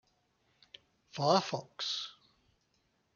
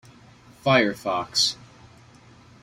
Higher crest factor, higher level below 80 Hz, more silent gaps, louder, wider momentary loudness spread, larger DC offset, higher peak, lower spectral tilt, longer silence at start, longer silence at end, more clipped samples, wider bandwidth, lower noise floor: about the same, 24 dB vs 24 dB; second, -80 dBFS vs -60 dBFS; neither; second, -33 LUFS vs -22 LUFS; first, 15 LU vs 9 LU; neither; second, -14 dBFS vs -4 dBFS; first, -4.5 dB/octave vs -3 dB/octave; first, 1.15 s vs 0.65 s; about the same, 1.05 s vs 1.1 s; neither; second, 7.2 kHz vs 16 kHz; first, -76 dBFS vs -51 dBFS